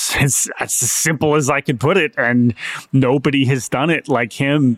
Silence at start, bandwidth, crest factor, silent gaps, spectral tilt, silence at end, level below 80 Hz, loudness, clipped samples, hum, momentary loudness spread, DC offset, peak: 0 s; 16.5 kHz; 12 dB; none; -4.5 dB/octave; 0 s; -46 dBFS; -16 LUFS; under 0.1%; none; 3 LU; under 0.1%; -4 dBFS